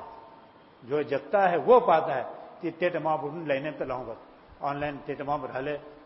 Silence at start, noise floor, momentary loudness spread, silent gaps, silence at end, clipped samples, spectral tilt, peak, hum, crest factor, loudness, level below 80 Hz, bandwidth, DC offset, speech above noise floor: 0 s; -53 dBFS; 16 LU; none; 0 s; under 0.1%; -10 dB/octave; -8 dBFS; none; 20 dB; -28 LUFS; -62 dBFS; 5.8 kHz; under 0.1%; 26 dB